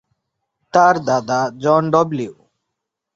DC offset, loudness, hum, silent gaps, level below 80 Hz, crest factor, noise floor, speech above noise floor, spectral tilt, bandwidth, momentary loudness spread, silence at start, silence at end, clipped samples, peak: under 0.1%; -16 LUFS; none; none; -62 dBFS; 18 dB; -79 dBFS; 64 dB; -6 dB/octave; 7.8 kHz; 9 LU; 0.75 s; 0.85 s; under 0.1%; -2 dBFS